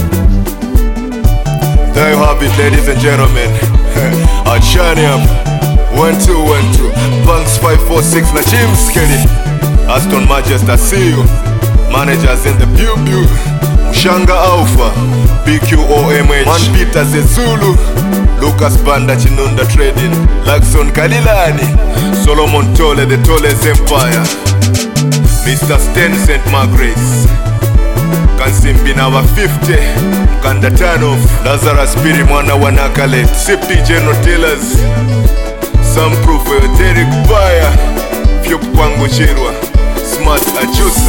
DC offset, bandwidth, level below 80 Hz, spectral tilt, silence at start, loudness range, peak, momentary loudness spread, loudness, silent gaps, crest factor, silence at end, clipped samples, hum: 1%; 19 kHz; -12 dBFS; -5 dB/octave; 0 s; 1 LU; 0 dBFS; 3 LU; -10 LUFS; none; 8 dB; 0 s; 3%; none